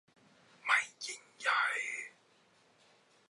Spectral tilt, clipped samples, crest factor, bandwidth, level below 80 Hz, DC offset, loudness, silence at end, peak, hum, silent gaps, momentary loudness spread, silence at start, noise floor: 1.5 dB/octave; under 0.1%; 24 dB; 11.5 kHz; under -90 dBFS; under 0.1%; -34 LUFS; 1.2 s; -14 dBFS; none; none; 12 LU; 0.65 s; -68 dBFS